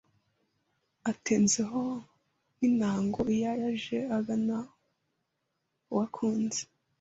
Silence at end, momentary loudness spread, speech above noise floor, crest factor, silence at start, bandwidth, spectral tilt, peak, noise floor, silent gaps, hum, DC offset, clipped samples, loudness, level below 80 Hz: 0.35 s; 10 LU; 52 dB; 16 dB; 1.05 s; 8 kHz; -4.5 dB/octave; -14 dBFS; -81 dBFS; none; none; under 0.1%; under 0.1%; -30 LUFS; -64 dBFS